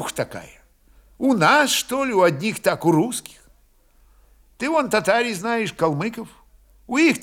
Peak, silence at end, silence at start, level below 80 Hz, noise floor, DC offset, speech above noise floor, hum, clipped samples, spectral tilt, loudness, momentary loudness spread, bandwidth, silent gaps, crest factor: -2 dBFS; 0 s; 0 s; -56 dBFS; -57 dBFS; under 0.1%; 36 dB; none; under 0.1%; -4 dB/octave; -20 LUFS; 13 LU; 17.5 kHz; none; 20 dB